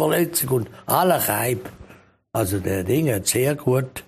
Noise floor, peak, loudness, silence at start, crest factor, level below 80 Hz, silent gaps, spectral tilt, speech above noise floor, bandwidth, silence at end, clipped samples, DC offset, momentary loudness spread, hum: -50 dBFS; -2 dBFS; -21 LUFS; 0 s; 18 dB; -52 dBFS; none; -4.5 dB/octave; 28 dB; 15.5 kHz; 0.05 s; under 0.1%; under 0.1%; 7 LU; none